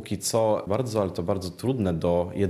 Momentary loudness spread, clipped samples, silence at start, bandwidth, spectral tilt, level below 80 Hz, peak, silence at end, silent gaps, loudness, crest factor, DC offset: 5 LU; under 0.1%; 0 s; 14.5 kHz; -6 dB/octave; -52 dBFS; -10 dBFS; 0 s; none; -26 LUFS; 16 dB; under 0.1%